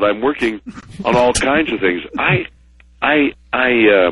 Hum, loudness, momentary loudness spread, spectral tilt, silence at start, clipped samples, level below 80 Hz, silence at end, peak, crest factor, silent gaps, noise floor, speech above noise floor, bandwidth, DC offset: none; -15 LUFS; 10 LU; -4.5 dB/octave; 0 s; under 0.1%; -40 dBFS; 0 s; 0 dBFS; 14 dB; none; -40 dBFS; 24 dB; 11.5 kHz; under 0.1%